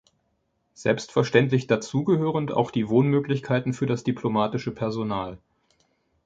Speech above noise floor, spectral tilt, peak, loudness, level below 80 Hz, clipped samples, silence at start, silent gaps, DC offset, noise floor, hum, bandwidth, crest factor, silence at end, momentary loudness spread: 49 dB; -7 dB/octave; -4 dBFS; -24 LUFS; -58 dBFS; under 0.1%; 0.8 s; none; under 0.1%; -72 dBFS; none; 7.8 kHz; 20 dB; 0.9 s; 8 LU